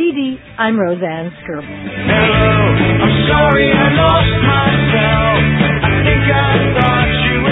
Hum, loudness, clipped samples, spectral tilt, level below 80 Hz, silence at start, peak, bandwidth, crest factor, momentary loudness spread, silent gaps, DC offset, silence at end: none; -12 LUFS; under 0.1%; -10 dB/octave; -26 dBFS; 0 s; 0 dBFS; 4 kHz; 12 dB; 11 LU; none; under 0.1%; 0 s